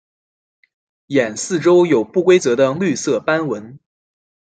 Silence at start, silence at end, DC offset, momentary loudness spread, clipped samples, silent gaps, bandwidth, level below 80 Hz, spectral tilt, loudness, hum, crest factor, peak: 1.1 s; 0.75 s; under 0.1%; 7 LU; under 0.1%; none; 9.2 kHz; -64 dBFS; -5 dB/octave; -16 LUFS; none; 16 dB; -2 dBFS